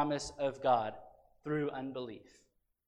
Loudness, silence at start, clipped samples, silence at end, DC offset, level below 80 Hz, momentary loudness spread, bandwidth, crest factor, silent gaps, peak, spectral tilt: -36 LUFS; 0 s; under 0.1%; 0.65 s; under 0.1%; -66 dBFS; 18 LU; 11 kHz; 20 dB; none; -18 dBFS; -5.5 dB/octave